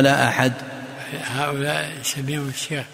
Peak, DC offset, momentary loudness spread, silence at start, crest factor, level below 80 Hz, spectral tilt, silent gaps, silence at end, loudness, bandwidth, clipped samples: -2 dBFS; under 0.1%; 14 LU; 0 s; 22 dB; -60 dBFS; -4 dB/octave; none; 0 s; -23 LUFS; 16 kHz; under 0.1%